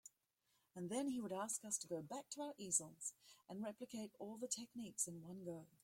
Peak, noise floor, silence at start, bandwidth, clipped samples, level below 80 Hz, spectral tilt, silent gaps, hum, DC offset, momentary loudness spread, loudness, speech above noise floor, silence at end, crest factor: -22 dBFS; -84 dBFS; 0.05 s; 16.5 kHz; under 0.1%; -86 dBFS; -3.5 dB/octave; none; none; under 0.1%; 12 LU; -46 LUFS; 37 dB; 0.15 s; 26 dB